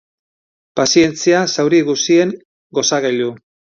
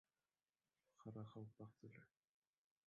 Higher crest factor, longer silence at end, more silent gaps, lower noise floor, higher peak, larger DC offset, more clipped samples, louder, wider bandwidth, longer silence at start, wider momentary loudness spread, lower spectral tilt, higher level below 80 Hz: about the same, 16 dB vs 20 dB; second, 0.45 s vs 0.8 s; first, 2.45-2.70 s vs none; about the same, under -90 dBFS vs under -90 dBFS; first, 0 dBFS vs -42 dBFS; neither; neither; first, -15 LUFS vs -60 LUFS; first, 7.6 kHz vs 6.8 kHz; second, 0.75 s vs 1 s; about the same, 11 LU vs 9 LU; second, -3.5 dB/octave vs -8 dB/octave; first, -58 dBFS vs -90 dBFS